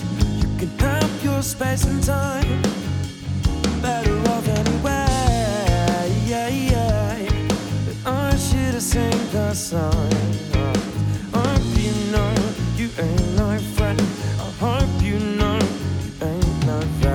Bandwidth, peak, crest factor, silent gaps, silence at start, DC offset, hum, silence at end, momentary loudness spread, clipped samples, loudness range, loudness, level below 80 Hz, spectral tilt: 18 kHz; -4 dBFS; 16 dB; none; 0 s; under 0.1%; none; 0 s; 4 LU; under 0.1%; 1 LU; -21 LUFS; -28 dBFS; -5.5 dB/octave